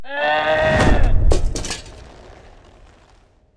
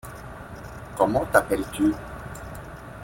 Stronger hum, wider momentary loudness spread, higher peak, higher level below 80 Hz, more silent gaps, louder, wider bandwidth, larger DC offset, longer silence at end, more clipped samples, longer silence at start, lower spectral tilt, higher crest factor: neither; second, 13 LU vs 18 LU; about the same, -4 dBFS vs -2 dBFS; first, -22 dBFS vs -44 dBFS; neither; first, -19 LUFS vs -23 LUFS; second, 11 kHz vs 17 kHz; neither; first, 1.55 s vs 0 s; neither; about the same, 0 s vs 0.05 s; about the same, -5 dB/octave vs -6 dB/octave; second, 14 dB vs 24 dB